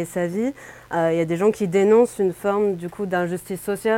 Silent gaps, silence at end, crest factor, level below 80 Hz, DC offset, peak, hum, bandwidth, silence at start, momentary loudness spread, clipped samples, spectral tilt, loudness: none; 0 s; 16 dB; -58 dBFS; under 0.1%; -6 dBFS; none; 17 kHz; 0 s; 11 LU; under 0.1%; -6.5 dB/octave; -21 LUFS